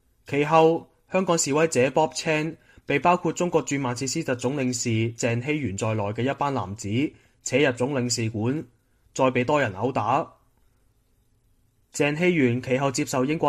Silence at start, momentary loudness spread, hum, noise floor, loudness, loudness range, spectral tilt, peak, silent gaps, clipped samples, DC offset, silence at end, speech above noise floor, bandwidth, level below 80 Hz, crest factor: 0.3 s; 7 LU; none; -65 dBFS; -24 LUFS; 4 LU; -5 dB/octave; -4 dBFS; none; under 0.1%; under 0.1%; 0 s; 41 dB; 15 kHz; -60 dBFS; 20 dB